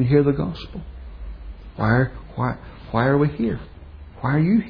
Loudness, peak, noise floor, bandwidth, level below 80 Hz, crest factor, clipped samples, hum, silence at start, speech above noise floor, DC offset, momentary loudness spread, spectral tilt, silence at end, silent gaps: -22 LUFS; -4 dBFS; -40 dBFS; 5.2 kHz; -38 dBFS; 18 dB; under 0.1%; none; 0 s; 20 dB; under 0.1%; 21 LU; -10.5 dB/octave; 0 s; none